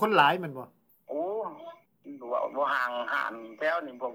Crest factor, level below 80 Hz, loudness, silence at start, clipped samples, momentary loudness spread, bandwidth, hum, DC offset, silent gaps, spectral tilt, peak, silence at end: 22 dB; -88 dBFS; -30 LUFS; 0 s; under 0.1%; 21 LU; over 20 kHz; none; under 0.1%; none; -5.5 dB/octave; -8 dBFS; 0 s